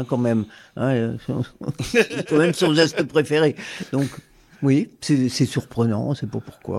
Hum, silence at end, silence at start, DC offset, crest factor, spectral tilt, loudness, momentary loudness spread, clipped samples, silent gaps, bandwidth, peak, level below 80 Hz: none; 0 s; 0 s; under 0.1%; 20 dB; -6 dB/octave; -21 LUFS; 11 LU; under 0.1%; none; 14.5 kHz; -2 dBFS; -54 dBFS